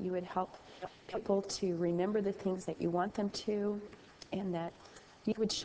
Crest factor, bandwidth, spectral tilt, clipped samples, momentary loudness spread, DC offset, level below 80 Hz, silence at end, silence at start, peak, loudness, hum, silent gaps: 18 dB; 8 kHz; -5.5 dB/octave; under 0.1%; 15 LU; under 0.1%; -66 dBFS; 0 s; 0 s; -18 dBFS; -37 LUFS; none; none